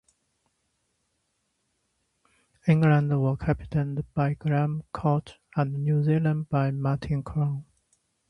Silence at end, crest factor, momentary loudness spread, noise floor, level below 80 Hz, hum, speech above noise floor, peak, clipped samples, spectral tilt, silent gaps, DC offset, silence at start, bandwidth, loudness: 0.65 s; 20 dB; 8 LU; -76 dBFS; -50 dBFS; none; 51 dB; -8 dBFS; under 0.1%; -9.5 dB/octave; none; under 0.1%; 2.65 s; 5.8 kHz; -26 LUFS